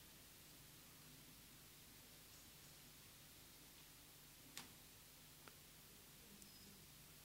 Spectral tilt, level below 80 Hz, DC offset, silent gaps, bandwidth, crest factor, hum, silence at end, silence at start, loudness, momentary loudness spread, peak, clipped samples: -2 dB/octave; -76 dBFS; under 0.1%; none; 16 kHz; 30 dB; none; 0 s; 0 s; -61 LUFS; 3 LU; -34 dBFS; under 0.1%